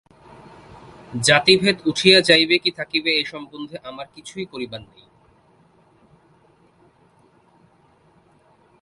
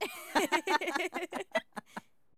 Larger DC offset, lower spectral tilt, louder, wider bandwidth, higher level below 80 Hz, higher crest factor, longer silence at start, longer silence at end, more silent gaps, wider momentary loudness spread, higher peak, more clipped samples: neither; about the same, -3 dB/octave vs -2 dB/octave; first, -16 LUFS vs -33 LUFS; second, 11.5 kHz vs over 20 kHz; first, -58 dBFS vs -72 dBFS; about the same, 22 dB vs 20 dB; first, 1.1 s vs 0 s; first, 4 s vs 0.4 s; neither; first, 21 LU vs 16 LU; first, 0 dBFS vs -14 dBFS; neither